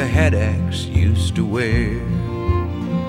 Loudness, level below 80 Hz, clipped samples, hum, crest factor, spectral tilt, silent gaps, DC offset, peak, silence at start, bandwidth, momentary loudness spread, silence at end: -19 LUFS; -28 dBFS; under 0.1%; none; 14 dB; -6.5 dB/octave; none; 0.2%; -4 dBFS; 0 s; 11.5 kHz; 6 LU; 0 s